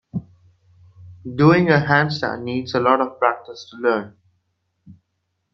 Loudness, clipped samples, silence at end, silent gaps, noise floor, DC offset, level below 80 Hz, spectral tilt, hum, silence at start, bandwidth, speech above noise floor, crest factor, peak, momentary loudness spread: -18 LUFS; under 0.1%; 0.6 s; none; -74 dBFS; under 0.1%; -58 dBFS; -7.5 dB/octave; none; 0.15 s; 6.6 kHz; 55 dB; 20 dB; 0 dBFS; 17 LU